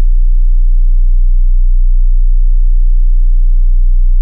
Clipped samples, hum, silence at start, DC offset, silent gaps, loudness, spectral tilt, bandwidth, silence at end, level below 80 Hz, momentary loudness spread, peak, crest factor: under 0.1%; none; 0 s; under 0.1%; none; -15 LUFS; -16 dB/octave; 0.2 kHz; 0 s; -6 dBFS; 0 LU; -2 dBFS; 4 dB